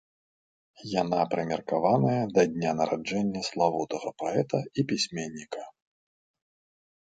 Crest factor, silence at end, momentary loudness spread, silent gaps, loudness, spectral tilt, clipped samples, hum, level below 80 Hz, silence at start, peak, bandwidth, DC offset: 20 dB; 1.35 s; 12 LU; none; -28 LUFS; -5.5 dB/octave; under 0.1%; none; -66 dBFS; 0.8 s; -8 dBFS; 9.2 kHz; under 0.1%